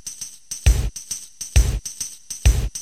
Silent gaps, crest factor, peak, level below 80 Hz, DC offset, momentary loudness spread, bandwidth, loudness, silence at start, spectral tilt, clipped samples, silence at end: none; 18 dB; -2 dBFS; -22 dBFS; 0.5%; 10 LU; 15.5 kHz; -23 LUFS; 0.05 s; -3.5 dB/octave; under 0.1%; 0 s